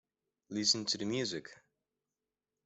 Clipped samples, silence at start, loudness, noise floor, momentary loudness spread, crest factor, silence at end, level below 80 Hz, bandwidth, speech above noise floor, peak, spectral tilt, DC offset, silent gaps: under 0.1%; 0.5 s; -33 LUFS; under -90 dBFS; 12 LU; 22 dB; 1.1 s; -78 dBFS; 8.2 kHz; over 55 dB; -16 dBFS; -2.5 dB/octave; under 0.1%; none